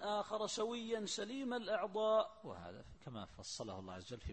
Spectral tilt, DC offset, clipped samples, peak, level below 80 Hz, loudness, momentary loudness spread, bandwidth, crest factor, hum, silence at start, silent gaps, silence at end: -3.5 dB/octave; under 0.1%; under 0.1%; -24 dBFS; -62 dBFS; -41 LUFS; 16 LU; 8.4 kHz; 18 dB; none; 0 s; none; 0 s